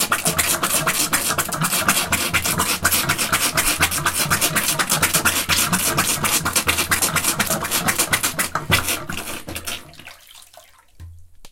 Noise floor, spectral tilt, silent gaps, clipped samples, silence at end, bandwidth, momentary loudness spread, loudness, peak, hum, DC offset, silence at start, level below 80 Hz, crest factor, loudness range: -48 dBFS; -1.5 dB/octave; none; under 0.1%; 0.05 s; 17 kHz; 6 LU; -18 LUFS; 0 dBFS; none; under 0.1%; 0 s; -42 dBFS; 20 dB; 5 LU